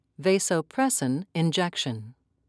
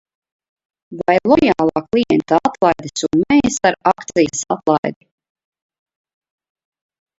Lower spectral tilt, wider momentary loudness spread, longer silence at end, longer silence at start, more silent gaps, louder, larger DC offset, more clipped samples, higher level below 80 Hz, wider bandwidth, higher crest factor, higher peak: about the same, -4 dB/octave vs -4.5 dB/octave; about the same, 6 LU vs 6 LU; second, 0.35 s vs 2.25 s; second, 0.2 s vs 0.9 s; second, none vs 4.78-4.83 s; second, -26 LUFS vs -16 LUFS; neither; neither; second, -74 dBFS vs -50 dBFS; first, 11 kHz vs 8 kHz; about the same, 16 dB vs 18 dB; second, -10 dBFS vs 0 dBFS